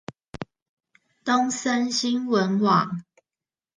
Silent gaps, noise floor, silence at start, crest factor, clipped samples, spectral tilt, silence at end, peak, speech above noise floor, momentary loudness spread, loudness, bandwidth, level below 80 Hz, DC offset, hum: 0.62-0.77 s; under -90 dBFS; 0.4 s; 18 dB; under 0.1%; -4.5 dB/octave; 0.75 s; -8 dBFS; over 68 dB; 19 LU; -23 LUFS; 9.8 kHz; -62 dBFS; under 0.1%; none